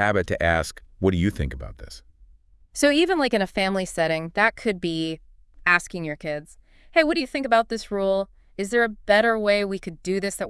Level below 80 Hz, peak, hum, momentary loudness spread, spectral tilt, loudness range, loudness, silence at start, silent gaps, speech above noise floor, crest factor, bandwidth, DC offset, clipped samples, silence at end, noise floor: -44 dBFS; -4 dBFS; none; 13 LU; -4.5 dB/octave; 2 LU; -23 LUFS; 0 s; none; 31 dB; 20 dB; 12 kHz; under 0.1%; under 0.1%; 0 s; -54 dBFS